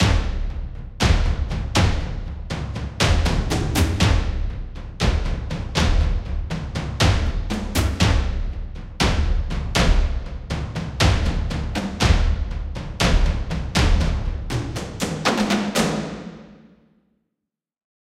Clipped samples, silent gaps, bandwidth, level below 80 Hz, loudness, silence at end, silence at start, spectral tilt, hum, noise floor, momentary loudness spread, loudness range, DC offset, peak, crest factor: under 0.1%; none; 15.5 kHz; -24 dBFS; -23 LUFS; 1.5 s; 0 s; -5 dB/octave; none; -82 dBFS; 11 LU; 2 LU; under 0.1%; -4 dBFS; 18 dB